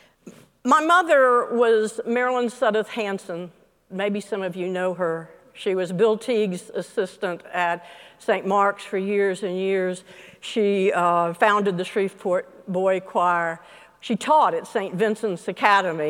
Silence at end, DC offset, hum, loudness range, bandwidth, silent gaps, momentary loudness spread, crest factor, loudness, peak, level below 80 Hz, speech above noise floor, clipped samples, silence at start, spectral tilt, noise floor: 0 s; under 0.1%; none; 5 LU; 16 kHz; none; 12 LU; 22 dB; -22 LUFS; -2 dBFS; -72 dBFS; 25 dB; under 0.1%; 0.25 s; -5 dB/octave; -48 dBFS